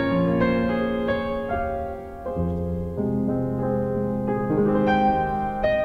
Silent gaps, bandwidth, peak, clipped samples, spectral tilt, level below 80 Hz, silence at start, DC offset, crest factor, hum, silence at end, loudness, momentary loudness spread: none; 6 kHz; -8 dBFS; under 0.1%; -9 dB/octave; -40 dBFS; 0 s; under 0.1%; 14 dB; none; 0 s; -24 LUFS; 8 LU